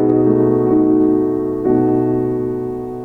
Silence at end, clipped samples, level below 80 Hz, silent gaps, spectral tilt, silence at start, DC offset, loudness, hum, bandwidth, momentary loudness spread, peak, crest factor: 0 s; under 0.1%; -44 dBFS; none; -11.5 dB/octave; 0 s; under 0.1%; -15 LUFS; none; 2.8 kHz; 8 LU; -2 dBFS; 14 dB